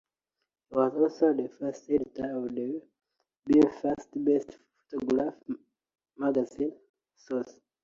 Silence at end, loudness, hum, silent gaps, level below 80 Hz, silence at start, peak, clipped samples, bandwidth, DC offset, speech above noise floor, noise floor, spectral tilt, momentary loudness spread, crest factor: 0.3 s; -29 LUFS; none; 6.89-6.94 s; -66 dBFS; 0.7 s; -10 dBFS; under 0.1%; 7.6 kHz; under 0.1%; 57 dB; -86 dBFS; -7.5 dB/octave; 15 LU; 20 dB